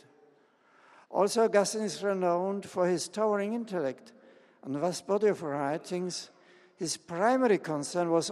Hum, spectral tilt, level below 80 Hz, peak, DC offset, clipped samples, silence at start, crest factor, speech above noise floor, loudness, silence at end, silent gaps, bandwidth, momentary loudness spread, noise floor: none; -4.5 dB/octave; -80 dBFS; -10 dBFS; under 0.1%; under 0.1%; 1.1 s; 20 dB; 35 dB; -30 LUFS; 0 s; none; 13 kHz; 11 LU; -64 dBFS